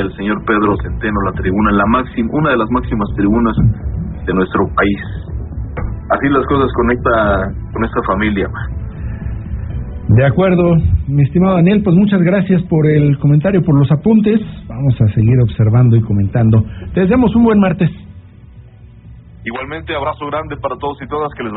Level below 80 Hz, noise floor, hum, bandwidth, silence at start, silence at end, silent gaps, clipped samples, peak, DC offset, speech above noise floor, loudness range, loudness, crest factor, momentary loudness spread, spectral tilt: -28 dBFS; -37 dBFS; none; 4.1 kHz; 0 s; 0 s; none; under 0.1%; 0 dBFS; under 0.1%; 25 dB; 5 LU; -14 LUFS; 12 dB; 13 LU; -7.5 dB/octave